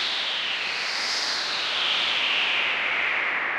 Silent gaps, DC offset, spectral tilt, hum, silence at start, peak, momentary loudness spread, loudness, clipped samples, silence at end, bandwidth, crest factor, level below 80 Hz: none; under 0.1%; 0.5 dB/octave; none; 0 s; -12 dBFS; 4 LU; -23 LUFS; under 0.1%; 0 s; 16 kHz; 14 dB; -68 dBFS